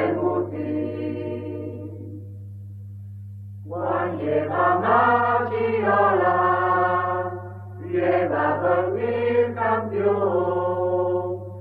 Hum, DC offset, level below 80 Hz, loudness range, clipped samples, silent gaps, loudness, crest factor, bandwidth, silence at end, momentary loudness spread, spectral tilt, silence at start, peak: 50 Hz at -35 dBFS; under 0.1%; -66 dBFS; 11 LU; under 0.1%; none; -22 LUFS; 16 dB; 4.8 kHz; 0 s; 20 LU; -9.5 dB/octave; 0 s; -8 dBFS